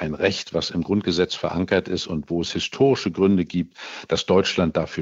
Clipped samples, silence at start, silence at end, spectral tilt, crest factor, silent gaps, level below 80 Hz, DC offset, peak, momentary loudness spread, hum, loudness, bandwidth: under 0.1%; 0 s; 0 s; -5.5 dB/octave; 18 dB; none; -48 dBFS; under 0.1%; -4 dBFS; 7 LU; none; -22 LUFS; 8 kHz